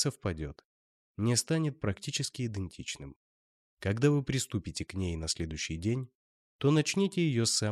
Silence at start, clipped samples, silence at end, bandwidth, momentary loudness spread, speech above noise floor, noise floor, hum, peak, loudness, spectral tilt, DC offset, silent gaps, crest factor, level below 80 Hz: 0 s; under 0.1%; 0 s; 15 kHz; 12 LU; over 59 dB; under -90 dBFS; none; -14 dBFS; -32 LUFS; -4.5 dB/octave; under 0.1%; 0.65-1.14 s, 3.16-3.77 s, 6.15-6.59 s; 18 dB; -52 dBFS